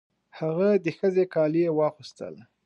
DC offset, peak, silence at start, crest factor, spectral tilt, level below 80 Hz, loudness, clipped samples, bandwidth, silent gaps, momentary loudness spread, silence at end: under 0.1%; -12 dBFS; 0.35 s; 14 dB; -8 dB/octave; -76 dBFS; -25 LUFS; under 0.1%; 8.4 kHz; none; 17 LU; 0.25 s